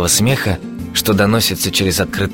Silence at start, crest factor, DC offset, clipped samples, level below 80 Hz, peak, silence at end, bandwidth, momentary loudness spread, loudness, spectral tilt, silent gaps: 0 s; 14 dB; under 0.1%; under 0.1%; -36 dBFS; 0 dBFS; 0 s; 17 kHz; 7 LU; -15 LUFS; -3.5 dB/octave; none